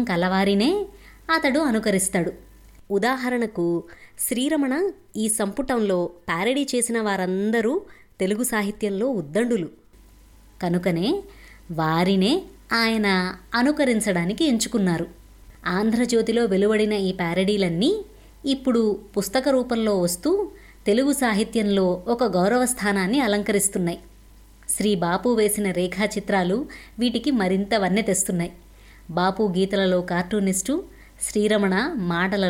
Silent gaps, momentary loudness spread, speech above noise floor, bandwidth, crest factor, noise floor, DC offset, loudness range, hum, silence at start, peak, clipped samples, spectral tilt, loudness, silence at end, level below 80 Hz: none; 8 LU; 28 dB; 17 kHz; 14 dB; -50 dBFS; under 0.1%; 3 LU; none; 0 s; -8 dBFS; under 0.1%; -4.5 dB/octave; -23 LUFS; 0 s; -50 dBFS